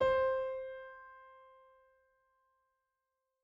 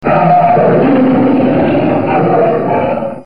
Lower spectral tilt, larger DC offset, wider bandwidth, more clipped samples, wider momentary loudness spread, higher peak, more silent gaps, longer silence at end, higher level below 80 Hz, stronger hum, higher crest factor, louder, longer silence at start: second, -5.5 dB/octave vs -10 dB/octave; second, under 0.1% vs 3%; first, 7.4 kHz vs 5.2 kHz; neither; first, 25 LU vs 5 LU; second, -20 dBFS vs 0 dBFS; neither; first, 2.1 s vs 0 s; second, -66 dBFS vs -44 dBFS; neither; first, 18 dB vs 10 dB; second, -36 LUFS vs -10 LUFS; about the same, 0 s vs 0 s